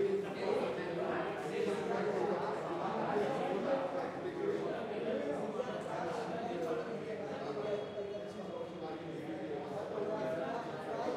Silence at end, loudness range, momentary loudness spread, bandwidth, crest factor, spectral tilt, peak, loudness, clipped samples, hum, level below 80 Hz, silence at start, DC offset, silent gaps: 0 s; 5 LU; 7 LU; 12.5 kHz; 16 dB; -6 dB/octave; -22 dBFS; -38 LUFS; under 0.1%; none; -76 dBFS; 0 s; under 0.1%; none